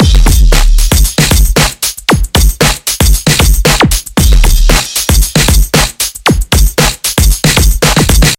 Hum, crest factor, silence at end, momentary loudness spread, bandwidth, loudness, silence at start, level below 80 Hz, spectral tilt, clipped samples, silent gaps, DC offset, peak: none; 8 dB; 0.05 s; 3 LU; 17 kHz; -9 LUFS; 0 s; -10 dBFS; -3.5 dB/octave; 0.6%; none; under 0.1%; 0 dBFS